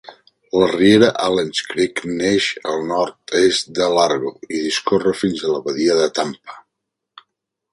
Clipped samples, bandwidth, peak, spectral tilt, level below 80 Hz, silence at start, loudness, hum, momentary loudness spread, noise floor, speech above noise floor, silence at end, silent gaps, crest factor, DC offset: under 0.1%; 11.5 kHz; 0 dBFS; -4 dB/octave; -56 dBFS; 0.05 s; -18 LUFS; none; 10 LU; -79 dBFS; 62 dB; 1.1 s; none; 18 dB; under 0.1%